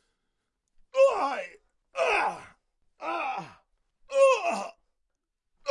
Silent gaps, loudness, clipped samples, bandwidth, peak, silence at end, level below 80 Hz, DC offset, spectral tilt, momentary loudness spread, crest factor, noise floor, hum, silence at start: none; -27 LUFS; under 0.1%; 11 kHz; -12 dBFS; 0 s; -68 dBFS; under 0.1%; -2.5 dB/octave; 19 LU; 18 dB; -80 dBFS; none; 0.95 s